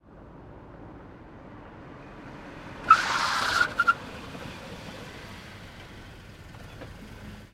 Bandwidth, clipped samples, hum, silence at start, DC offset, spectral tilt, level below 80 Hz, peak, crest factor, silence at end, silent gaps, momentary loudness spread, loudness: 15.5 kHz; under 0.1%; none; 0.05 s; under 0.1%; -2.5 dB/octave; -52 dBFS; -4 dBFS; 28 dB; 0.05 s; none; 25 LU; -24 LUFS